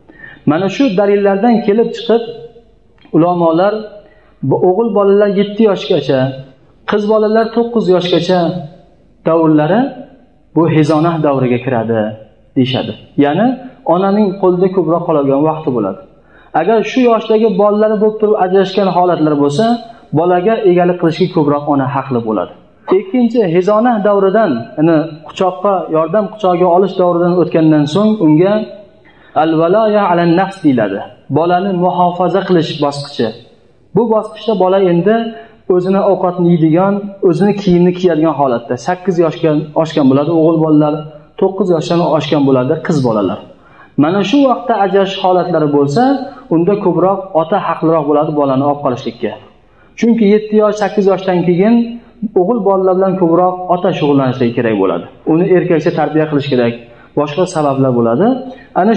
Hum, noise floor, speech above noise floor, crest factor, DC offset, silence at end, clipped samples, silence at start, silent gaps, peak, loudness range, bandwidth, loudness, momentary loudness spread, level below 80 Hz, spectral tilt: none; -46 dBFS; 35 dB; 12 dB; 0.3%; 0 s; under 0.1%; 0.2 s; none; 0 dBFS; 2 LU; 9.2 kHz; -12 LUFS; 8 LU; -52 dBFS; -7.5 dB/octave